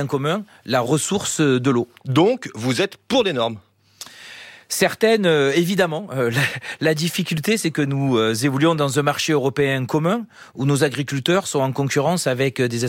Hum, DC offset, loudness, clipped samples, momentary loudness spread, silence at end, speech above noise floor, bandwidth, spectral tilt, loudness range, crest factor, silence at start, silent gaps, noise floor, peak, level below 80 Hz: none; under 0.1%; -20 LUFS; under 0.1%; 8 LU; 0 s; 23 dB; 17 kHz; -5 dB/octave; 2 LU; 16 dB; 0 s; none; -42 dBFS; -4 dBFS; -60 dBFS